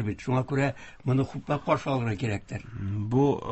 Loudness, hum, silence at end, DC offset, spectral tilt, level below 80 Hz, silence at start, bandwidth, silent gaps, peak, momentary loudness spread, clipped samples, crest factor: -28 LUFS; none; 0 s; under 0.1%; -7.5 dB/octave; -50 dBFS; 0 s; 8.4 kHz; none; -10 dBFS; 10 LU; under 0.1%; 18 dB